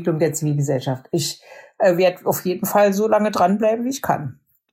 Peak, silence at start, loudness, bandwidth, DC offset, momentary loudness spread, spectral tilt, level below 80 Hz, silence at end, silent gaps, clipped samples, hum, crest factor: -4 dBFS; 0 s; -20 LUFS; 16.5 kHz; under 0.1%; 8 LU; -5.5 dB/octave; -62 dBFS; 0.4 s; none; under 0.1%; none; 16 dB